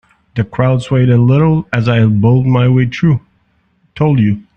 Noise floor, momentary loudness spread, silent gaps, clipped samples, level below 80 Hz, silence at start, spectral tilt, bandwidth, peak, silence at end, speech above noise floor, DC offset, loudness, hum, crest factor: -57 dBFS; 7 LU; none; under 0.1%; -40 dBFS; 0.35 s; -9 dB/octave; 8.2 kHz; 0 dBFS; 0.15 s; 46 dB; under 0.1%; -12 LUFS; none; 12 dB